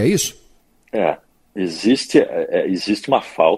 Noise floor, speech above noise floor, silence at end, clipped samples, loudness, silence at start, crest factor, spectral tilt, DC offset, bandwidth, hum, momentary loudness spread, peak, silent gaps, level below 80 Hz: -54 dBFS; 36 dB; 0 s; under 0.1%; -19 LUFS; 0 s; 18 dB; -4.5 dB/octave; under 0.1%; 15.5 kHz; none; 11 LU; 0 dBFS; none; -56 dBFS